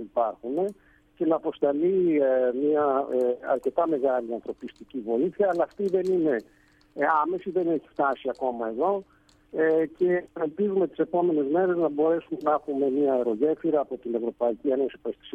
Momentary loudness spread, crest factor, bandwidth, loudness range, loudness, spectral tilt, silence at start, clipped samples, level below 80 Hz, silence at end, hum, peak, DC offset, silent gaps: 7 LU; 16 dB; 8.2 kHz; 2 LU; -26 LUFS; -8.5 dB/octave; 0 s; under 0.1%; -66 dBFS; 0.05 s; none; -10 dBFS; under 0.1%; none